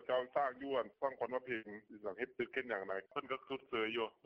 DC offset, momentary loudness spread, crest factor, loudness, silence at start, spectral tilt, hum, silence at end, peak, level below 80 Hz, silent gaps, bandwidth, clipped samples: under 0.1%; 6 LU; 18 dB; -41 LUFS; 0 s; -6.5 dB/octave; none; 0.15 s; -22 dBFS; -80 dBFS; none; 6 kHz; under 0.1%